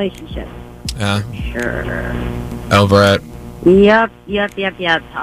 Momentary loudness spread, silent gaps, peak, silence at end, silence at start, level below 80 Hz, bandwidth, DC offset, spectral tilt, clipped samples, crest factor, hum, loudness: 18 LU; none; 0 dBFS; 0 s; 0 s; -32 dBFS; 15.5 kHz; under 0.1%; -6 dB/octave; under 0.1%; 16 dB; none; -15 LUFS